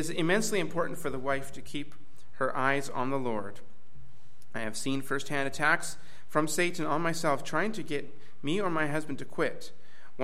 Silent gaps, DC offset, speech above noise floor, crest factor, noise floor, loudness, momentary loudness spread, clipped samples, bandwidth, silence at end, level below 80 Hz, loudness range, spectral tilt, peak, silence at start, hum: none; 3%; 29 dB; 22 dB; -60 dBFS; -31 LUFS; 13 LU; under 0.1%; 16.5 kHz; 0 s; -64 dBFS; 4 LU; -4 dB/octave; -10 dBFS; 0 s; none